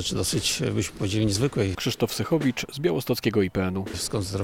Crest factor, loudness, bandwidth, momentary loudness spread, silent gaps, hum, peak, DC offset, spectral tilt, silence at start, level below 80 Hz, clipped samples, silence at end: 16 dB; -25 LUFS; 17.5 kHz; 4 LU; none; none; -10 dBFS; under 0.1%; -4.5 dB/octave; 0 s; -48 dBFS; under 0.1%; 0 s